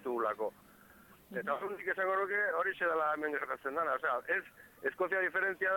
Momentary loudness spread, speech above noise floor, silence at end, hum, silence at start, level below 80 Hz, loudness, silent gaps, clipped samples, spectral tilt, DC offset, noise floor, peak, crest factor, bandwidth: 8 LU; 25 dB; 0 s; none; 0 s; -76 dBFS; -34 LUFS; none; under 0.1%; -5 dB/octave; under 0.1%; -60 dBFS; -22 dBFS; 14 dB; 17.5 kHz